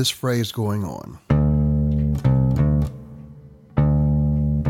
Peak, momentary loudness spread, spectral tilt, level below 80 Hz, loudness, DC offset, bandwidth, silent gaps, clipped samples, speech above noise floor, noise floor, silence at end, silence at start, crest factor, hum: -4 dBFS; 12 LU; -6.5 dB/octave; -28 dBFS; -21 LUFS; under 0.1%; 15.5 kHz; none; under 0.1%; 20 dB; -44 dBFS; 0 s; 0 s; 16 dB; none